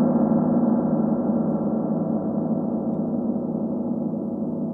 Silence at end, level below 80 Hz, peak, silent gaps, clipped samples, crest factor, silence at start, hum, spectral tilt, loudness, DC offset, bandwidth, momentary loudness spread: 0 s; -58 dBFS; -10 dBFS; none; under 0.1%; 14 dB; 0 s; none; -14 dB/octave; -24 LUFS; under 0.1%; 1.9 kHz; 6 LU